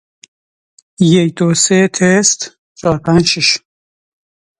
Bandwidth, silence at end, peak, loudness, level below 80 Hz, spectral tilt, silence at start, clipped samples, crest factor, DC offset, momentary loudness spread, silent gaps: 11.5 kHz; 1.05 s; 0 dBFS; -12 LUFS; -48 dBFS; -4 dB/octave; 1 s; under 0.1%; 14 dB; under 0.1%; 9 LU; 2.58-2.75 s